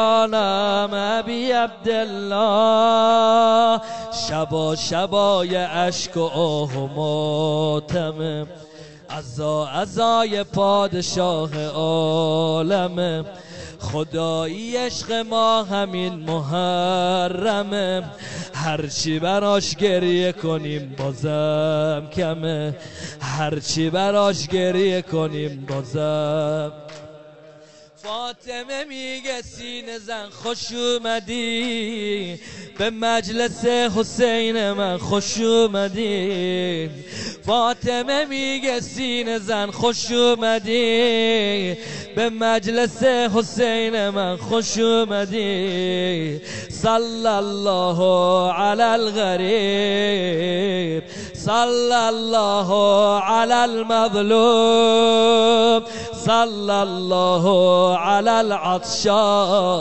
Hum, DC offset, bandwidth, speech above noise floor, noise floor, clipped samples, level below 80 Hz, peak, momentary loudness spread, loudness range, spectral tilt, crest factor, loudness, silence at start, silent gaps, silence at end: none; 0.7%; 8.6 kHz; 27 dB; -47 dBFS; under 0.1%; -54 dBFS; -4 dBFS; 12 LU; 7 LU; -4.5 dB/octave; 16 dB; -20 LUFS; 0 s; none; 0 s